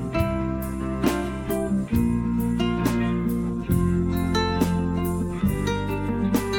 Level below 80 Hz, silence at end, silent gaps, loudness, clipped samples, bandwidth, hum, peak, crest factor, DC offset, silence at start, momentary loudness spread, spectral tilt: -34 dBFS; 0 s; none; -24 LUFS; under 0.1%; 18.5 kHz; none; -8 dBFS; 16 dB; under 0.1%; 0 s; 4 LU; -6.5 dB/octave